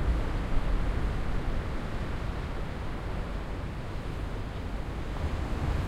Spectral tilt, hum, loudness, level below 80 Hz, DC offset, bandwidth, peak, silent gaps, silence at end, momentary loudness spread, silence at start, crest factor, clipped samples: -7 dB/octave; none; -35 LUFS; -32 dBFS; under 0.1%; 12 kHz; -14 dBFS; none; 0 s; 5 LU; 0 s; 16 dB; under 0.1%